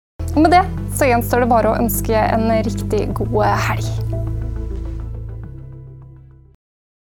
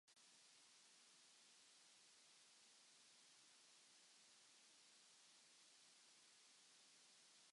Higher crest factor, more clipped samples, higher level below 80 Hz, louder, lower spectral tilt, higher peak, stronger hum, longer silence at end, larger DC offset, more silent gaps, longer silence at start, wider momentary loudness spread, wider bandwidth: about the same, 18 dB vs 14 dB; neither; first, -28 dBFS vs under -90 dBFS; first, -17 LUFS vs -69 LUFS; first, -6 dB/octave vs 1 dB/octave; first, 0 dBFS vs -58 dBFS; neither; first, 1 s vs 0 s; neither; neither; first, 0.2 s vs 0.05 s; first, 18 LU vs 0 LU; first, 18 kHz vs 11.5 kHz